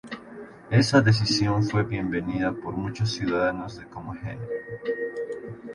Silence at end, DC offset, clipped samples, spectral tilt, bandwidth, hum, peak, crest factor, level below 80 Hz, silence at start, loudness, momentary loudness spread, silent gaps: 0 s; under 0.1%; under 0.1%; -6 dB/octave; 11.5 kHz; none; -6 dBFS; 20 dB; -50 dBFS; 0.05 s; -25 LUFS; 18 LU; none